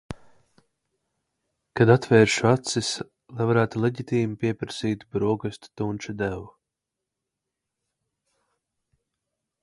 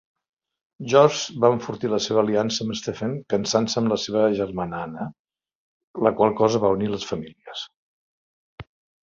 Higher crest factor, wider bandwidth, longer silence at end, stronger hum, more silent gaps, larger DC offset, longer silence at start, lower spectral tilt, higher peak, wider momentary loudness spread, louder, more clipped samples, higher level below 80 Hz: about the same, 24 dB vs 22 dB; first, 11.5 kHz vs 7.6 kHz; first, 3.15 s vs 0.4 s; neither; second, none vs 5.19-5.25 s, 5.55-5.94 s, 7.76-8.58 s; neither; second, 0.1 s vs 0.8 s; about the same, -5.5 dB/octave vs -5 dB/octave; about the same, -2 dBFS vs -2 dBFS; about the same, 17 LU vs 15 LU; about the same, -24 LUFS vs -22 LUFS; neither; about the same, -56 dBFS vs -58 dBFS